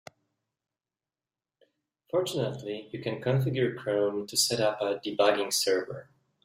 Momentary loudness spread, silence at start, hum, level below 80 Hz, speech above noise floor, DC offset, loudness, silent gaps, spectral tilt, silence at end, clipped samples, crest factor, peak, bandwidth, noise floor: 10 LU; 2.15 s; none; -70 dBFS; over 62 dB; under 0.1%; -28 LUFS; none; -4 dB/octave; 0.4 s; under 0.1%; 20 dB; -10 dBFS; 16 kHz; under -90 dBFS